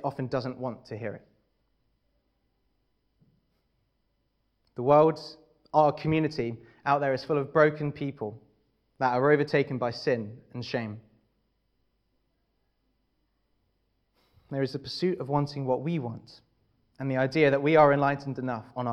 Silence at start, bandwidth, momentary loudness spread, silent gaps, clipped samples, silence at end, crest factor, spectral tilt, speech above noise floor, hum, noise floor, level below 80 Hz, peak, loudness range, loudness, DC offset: 0 s; 9.6 kHz; 17 LU; none; under 0.1%; 0 s; 22 dB; -7.5 dB/octave; 48 dB; none; -75 dBFS; -64 dBFS; -6 dBFS; 15 LU; -27 LUFS; under 0.1%